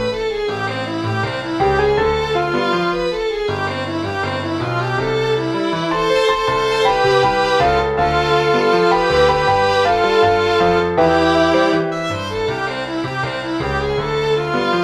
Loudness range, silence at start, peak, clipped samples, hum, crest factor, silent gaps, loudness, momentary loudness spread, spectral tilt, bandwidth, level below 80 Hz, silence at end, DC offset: 5 LU; 0 s; -2 dBFS; under 0.1%; none; 16 dB; none; -17 LUFS; 8 LU; -5.5 dB/octave; 12.5 kHz; -38 dBFS; 0 s; under 0.1%